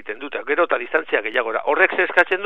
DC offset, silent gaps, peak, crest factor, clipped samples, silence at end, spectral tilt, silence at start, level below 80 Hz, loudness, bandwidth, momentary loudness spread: 0.9%; none; 0 dBFS; 20 dB; under 0.1%; 0 s; -4 dB/octave; 0.05 s; -72 dBFS; -19 LUFS; 9.8 kHz; 6 LU